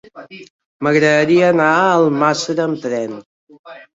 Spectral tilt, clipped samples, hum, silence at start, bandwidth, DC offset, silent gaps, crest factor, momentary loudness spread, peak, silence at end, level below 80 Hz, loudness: -5.5 dB/octave; under 0.1%; none; 0.15 s; 8 kHz; under 0.1%; 0.50-0.59 s, 0.66-0.79 s, 3.26-3.47 s, 3.59-3.64 s; 14 dB; 12 LU; -2 dBFS; 0.1 s; -62 dBFS; -14 LUFS